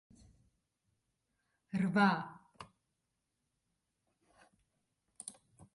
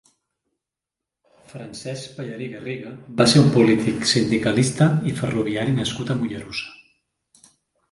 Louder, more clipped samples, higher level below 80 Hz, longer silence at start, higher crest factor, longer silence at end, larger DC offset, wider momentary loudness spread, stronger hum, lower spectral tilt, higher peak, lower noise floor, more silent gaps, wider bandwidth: second, -33 LUFS vs -20 LUFS; neither; second, -76 dBFS vs -54 dBFS; first, 1.75 s vs 1.55 s; about the same, 24 dB vs 22 dB; second, 0.45 s vs 1.15 s; neither; first, 26 LU vs 17 LU; neither; about the same, -6 dB/octave vs -5.5 dB/octave; second, -18 dBFS vs -2 dBFS; about the same, -86 dBFS vs -86 dBFS; neither; about the same, 11.5 kHz vs 11.5 kHz